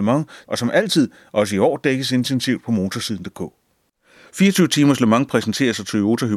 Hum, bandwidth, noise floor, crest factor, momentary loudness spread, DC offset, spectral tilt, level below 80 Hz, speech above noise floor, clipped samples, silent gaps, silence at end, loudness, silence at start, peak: none; 15 kHz; -64 dBFS; 18 dB; 11 LU; under 0.1%; -5 dB/octave; -60 dBFS; 46 dB; under 0.1%; none; 0 s; -19 LUFS; 0 s; -2 dBFS